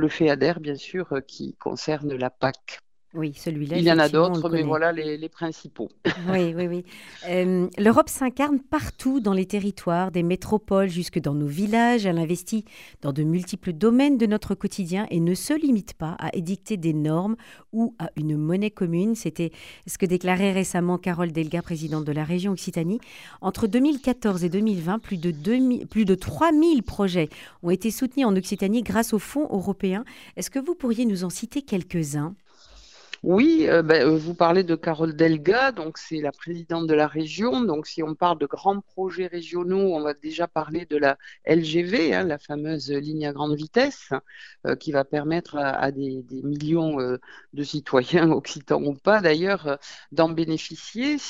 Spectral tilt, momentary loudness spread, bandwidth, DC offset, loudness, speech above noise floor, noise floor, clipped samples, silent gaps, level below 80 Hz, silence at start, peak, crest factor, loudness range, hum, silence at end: -6 dB/octave; 11 LU; 16 kHz; 0.1%; -24 LUFS; 28 dB; -51 dBFS; under 0.1%; none; -54 dBFS; 0 s; -4 dBFS; 20 dB; 4 LU; none; 0 s